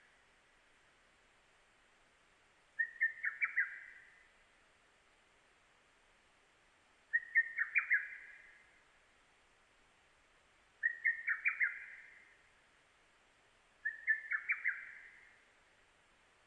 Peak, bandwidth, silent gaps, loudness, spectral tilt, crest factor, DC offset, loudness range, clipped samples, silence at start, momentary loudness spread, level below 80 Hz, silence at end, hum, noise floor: -20 dBFS; 10 kHz; none; -36 LUFS; -1 dB/octave; 24 dB; under 0.1%; 5 LU; under 0.1%; 2.8 s; 22 LU; -84 dBFS; 1.3 s; none; -70 dBFS